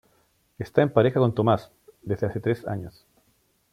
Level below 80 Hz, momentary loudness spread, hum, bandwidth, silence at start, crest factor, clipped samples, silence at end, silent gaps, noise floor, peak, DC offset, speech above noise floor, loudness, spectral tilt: -58 dBFS; 17 LU; none; 14 kHz; 0.6 s; 22 dB; under 0.1%; 0.85 s; none; -67 dBFS; -4 dBFS; under 0.1%; 43 dB; -24 LUFS; -8.5 dB/octave